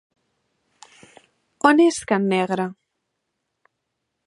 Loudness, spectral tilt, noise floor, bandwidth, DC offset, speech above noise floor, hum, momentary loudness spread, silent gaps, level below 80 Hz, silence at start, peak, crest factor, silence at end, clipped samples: -19 LUFS; -5 dB/octave; -78 dBFS; 11.5 kHz; under 0.1%; 59 dB; none; 10 LU; none; -66 dBFS; 1.65 s; -2 dBFS; 22 dB; 1.55 s; under 0.1%